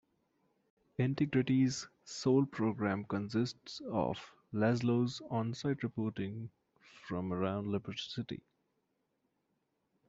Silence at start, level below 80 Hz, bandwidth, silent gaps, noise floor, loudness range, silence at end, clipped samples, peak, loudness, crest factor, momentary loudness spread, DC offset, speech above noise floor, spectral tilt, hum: 1 s; -70 dBFS; 8 kHz; none; -81 dBFS; 7 LU; 1.7 s; under 0.1%; -18 dBFS; -35 LUFS; 18 dB; 14 LU; under 0.1%; 47 dB; -6.5 dB/octave; none